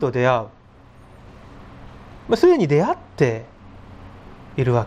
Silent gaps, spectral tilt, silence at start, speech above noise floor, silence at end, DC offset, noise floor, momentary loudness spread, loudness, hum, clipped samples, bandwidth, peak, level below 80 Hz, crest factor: none; -7.5 dB/octave; 0 s; 29 dB; 0 s; under 0.1%; -47 dBFS; 27 LU; -19 LUFS; none; under 0.1%; 9.2 kHz; -2 dBFS; -48 dBFS; 20 dB